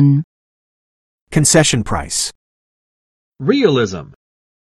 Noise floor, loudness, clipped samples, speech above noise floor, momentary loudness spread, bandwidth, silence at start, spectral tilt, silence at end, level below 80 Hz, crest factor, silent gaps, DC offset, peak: under -90 dBFS; -15 LUFS; under 0.1%; over 76 dB; 12 LU; 12.5 kHz; 0 s; -4.5 dB/octave; 0.6 s; -40 dBFS; 18 dB; 0.24-1.27 s, 2.35-3.32 s; under 0.1%; 0 dBFS